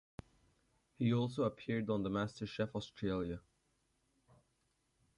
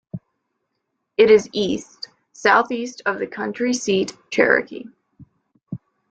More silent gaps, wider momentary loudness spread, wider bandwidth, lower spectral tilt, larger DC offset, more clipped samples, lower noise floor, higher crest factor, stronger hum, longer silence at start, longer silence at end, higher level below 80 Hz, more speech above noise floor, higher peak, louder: neither; second, 11 LU vs 22 LU; first, 11 kHz vs 9 kHz; first, -7.5 dB/octave vs -4 dB/octave; neither; neither; first, -80 dBFS vs -76 dBFS; about the same, 18 dB vs 20 dB; neither; first, 1 s vs 0.15 s; first, 1.8 s vs 0.35 s; about the same, -64 dBFS vs -62 dBFS; second, 42 dB vs 57 dB; second, -24 dBFS vs 0 dBFS; second, -39 LUFS vs -19 LUFS